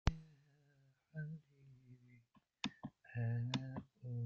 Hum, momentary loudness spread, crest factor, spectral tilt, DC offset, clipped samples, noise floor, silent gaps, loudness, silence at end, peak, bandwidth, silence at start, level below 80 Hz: none; 24 LU; 28 dB; -6 dB/octave; under 0.1%; under 0.1%; -74 dBFS; none; -46 LUFS; 0 s; -18 dBFS; 7.6 kHz; 0.05 s; -54 dBFS